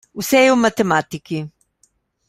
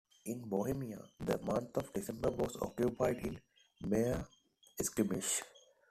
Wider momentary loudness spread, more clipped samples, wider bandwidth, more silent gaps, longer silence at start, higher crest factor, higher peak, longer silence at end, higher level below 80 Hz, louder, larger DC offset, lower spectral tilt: about the same, 14 LU vs 12 LU; neither; first, 16 kHz vs 14.5 kHz; neither; about the same, 0.15 s vs 0.25 s; about the same, 18 dB vs 20 dB; first, -2 dBFS vs -20 dBFS; first, 0.8 s vs 0.3 s; about the same, -58 dBFS vs -60 dBFS; first, -17 LUFS vs -38 LUFS; neither; about the same, -4.5 dB/octave vs -5 dB/octave